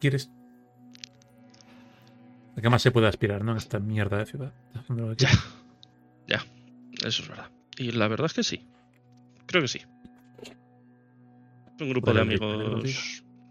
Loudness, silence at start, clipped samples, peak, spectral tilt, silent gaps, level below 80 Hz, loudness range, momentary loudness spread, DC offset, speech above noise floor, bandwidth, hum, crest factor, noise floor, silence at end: -27 LUFS; 0 s; under 0.1%; -4 dBFS; -5.5 dB/octave; none; -54 dBFS; 5 LU; 23 LU; under 0.1%; 32 dB; 13 kHz; none; 24 dB; -58 dBFS; 0.3 s